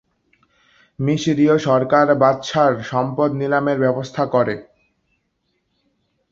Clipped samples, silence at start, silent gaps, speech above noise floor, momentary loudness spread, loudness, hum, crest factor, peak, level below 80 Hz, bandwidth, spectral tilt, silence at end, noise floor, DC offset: under 0.1%; 1 s; none; 53 dB; 7 LU; -18 LUFS; none; 18 dB; 0 dBFS; -58 dBFS; 7.8 kHz; -6.5 dB/octave; 1.7 s; -70 dBFS; under 0.1%